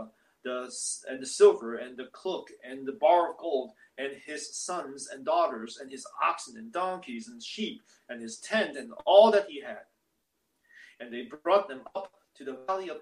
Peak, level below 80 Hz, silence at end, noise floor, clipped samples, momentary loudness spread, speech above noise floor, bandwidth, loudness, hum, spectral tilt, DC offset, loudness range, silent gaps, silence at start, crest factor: -6 dBFS; -80 dBFS; 0 s; -78 dBFS; under 0.1%; 20 LU; 49 dB; 12 kHz; -29 LUFS; none; -2.5 dB/octave; under 0.1%; 6 LU; none; 0 s; 24 dB